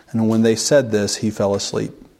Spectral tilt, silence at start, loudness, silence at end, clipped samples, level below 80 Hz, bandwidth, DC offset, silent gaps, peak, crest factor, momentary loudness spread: -4.5 dB/octave; 0.15 s; -18 LUFS; 0.25 s; under 0.1%; -56 dBFS; 15 kHz; under 0.1%; none; -2 dBFS; 16 dB; 7 LU